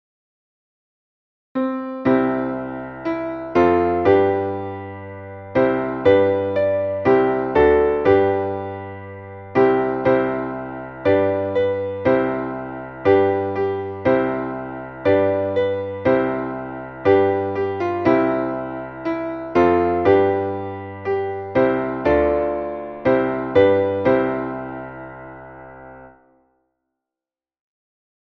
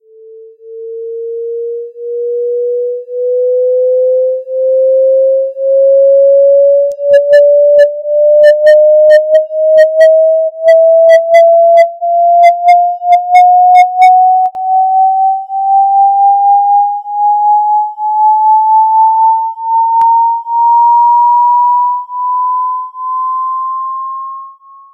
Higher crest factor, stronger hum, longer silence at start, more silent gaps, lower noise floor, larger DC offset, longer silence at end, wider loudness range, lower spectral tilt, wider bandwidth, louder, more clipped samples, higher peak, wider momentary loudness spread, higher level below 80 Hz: first, 18 dB vs 8 dB; neither; first, 1.55 s vs 0.3 s; neither; first, under -90 dBFS vs -34 dBFS; neither; first, 2.25 s vs 0.45 s; second, 3 LU vs 7 LU; first, -9 dB/octave vs -1 dB/octave; second, 6.2 kHz vs 9.2 kHz; second, -19 LUFS vs -8 LUFS; second, under 0.1% vs 1%; about the same, -2 dBFS vs 0 dBFS; first, 15 LU vs 12 LU; first, -46 dBFS vs -68 dBFS